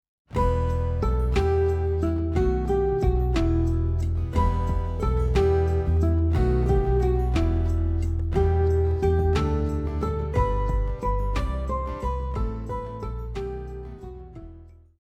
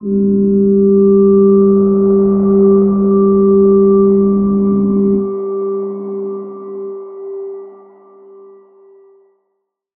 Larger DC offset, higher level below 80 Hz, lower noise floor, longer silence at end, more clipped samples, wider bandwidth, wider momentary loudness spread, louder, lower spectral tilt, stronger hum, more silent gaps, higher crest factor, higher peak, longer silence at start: neither; first, -26 dBFS vs -44 dBFS; second, -46 dBFS vs -70 dBFS; second, 0.3 s vs 2.25 s; neither; first, 8.4 kHz vs 1.5 kHz; second, 10 LU vs 17 LU; second, -25 LUFS vs -11 LUFS; second, -8.5 dB/octave vs -15.5 dB/octave; neither; neither; about the same, 14 dB vs 12 dB; second, -10 dBFS vs -2 dBFS; first, 0.3 s vs 0 s